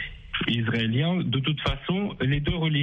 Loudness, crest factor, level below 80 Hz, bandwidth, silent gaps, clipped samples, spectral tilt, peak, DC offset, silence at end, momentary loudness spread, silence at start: -26 LUFS; 16 dB; -40 dBFS; 7 kHz; none; under 0.1%; -7.5 dB/octave; -10 dBFS; under 0.1%; 0 s; 4 LU; 0 s